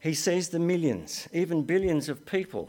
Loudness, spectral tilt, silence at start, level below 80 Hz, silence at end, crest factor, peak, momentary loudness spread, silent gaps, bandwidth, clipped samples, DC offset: -28 LUFS; -5 dB/octave; 0 s; -54 dBFS; 0 s; 14 dB; -14 dBFS; 5 LU; none; 17.5 kHz; under 0.1%; under 0.1%